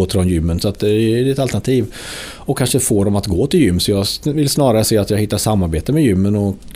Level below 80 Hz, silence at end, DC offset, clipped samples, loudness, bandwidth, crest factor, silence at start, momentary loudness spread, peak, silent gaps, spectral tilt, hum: -34 dBFS; 0.05 s; under 0.1%; under 0.1%; -16 LUFS; 16 kHz; 14 dB; 0 s; 5 LU; -2 dBFS; none; -5.5 dB/octave; none